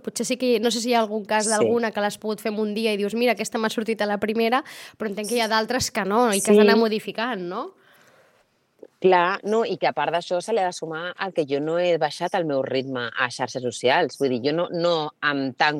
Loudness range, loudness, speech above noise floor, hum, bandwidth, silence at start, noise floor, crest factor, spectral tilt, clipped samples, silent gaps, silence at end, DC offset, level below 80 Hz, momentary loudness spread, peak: 4 LU; -23 LUFS; 41 dB; none; 16.5 kHz; 0.05 s; -64 dBFS; 20 dB; -4 dB/octave; under 0.1%; none; 0 s; under 0.1%; -64 dBFS; 8 LU; -4 dBFS